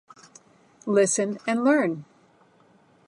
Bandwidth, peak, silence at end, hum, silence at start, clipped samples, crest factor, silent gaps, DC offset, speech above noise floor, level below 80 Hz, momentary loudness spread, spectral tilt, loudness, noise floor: 11.5 kHz; -10 dBFS; 1.05 s; none; 0.85 s; under 0.1%; 18 dB; none; under 0.1%; 36 dB; -80 dBFS; 13 LU; -4.5 dB/octave; -23 LUFS; -59 dBFS